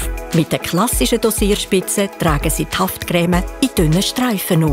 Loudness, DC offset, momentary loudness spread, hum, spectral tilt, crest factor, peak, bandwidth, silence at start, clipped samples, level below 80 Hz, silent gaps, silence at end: -17 LUFS; under 0.1%; 4 LU; none; -4.5 dB/octave; 14 dB; -2 dBFS; 16.5 kHz; 0 s; under 0.1%; -28 dBFS; none; 0 s